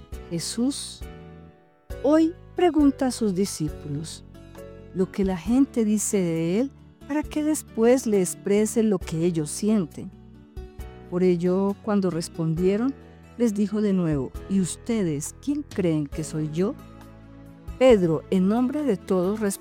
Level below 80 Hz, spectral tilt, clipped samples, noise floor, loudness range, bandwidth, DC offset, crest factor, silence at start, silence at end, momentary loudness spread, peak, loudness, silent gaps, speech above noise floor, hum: -46 dBFS; -6 dB/octave; under 0.1%; -51 dBFS; 2 LU; 18.5 kHz; under 0.1%; 18 dB; 0 s; 0 s; 20 LU; -6 dBFS; -24 LUFS; none; 28 dB; none